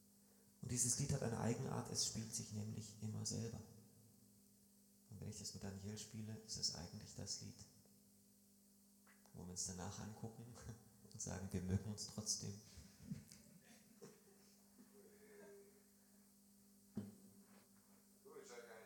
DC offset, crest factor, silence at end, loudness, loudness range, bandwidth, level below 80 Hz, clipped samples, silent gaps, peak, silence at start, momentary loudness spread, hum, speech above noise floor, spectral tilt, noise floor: under 0.1%; 24 dB; 0 s; -47 LUFS; 18 LU; 19 kHz; -72 dBFS; under 0.1%; none; -26 dBFS; 0 s; 26 LU; 50 Hz at -70 dBFS; 24 dB; -3.5 dB/octave; -71 dBFS